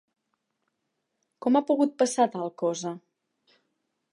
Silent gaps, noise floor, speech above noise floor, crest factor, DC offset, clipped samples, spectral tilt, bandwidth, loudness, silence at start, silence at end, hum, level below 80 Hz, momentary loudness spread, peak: none; -80 dBFS; 55 dB; 20 dB; under 0.1%; under 0.1%; -4.5 dB/octave; 11.5 kHz; -26 LUFS; 1.4 s; 1.15 s; none; -88 dBFS; 11 LU; -10 dBFS